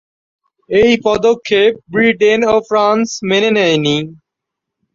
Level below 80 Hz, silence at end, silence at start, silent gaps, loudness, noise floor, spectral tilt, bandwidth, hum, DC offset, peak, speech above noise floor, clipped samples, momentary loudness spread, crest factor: -48 dBFS; 0.8 s; 0.7 s; none; -13 LUFS; -79 dBFS; -4.5 dB/octave; 7.6 kHz; none; under 0.1%; 0 dBFS; 67 dB; under 0.1%; 5 LU; 14 dB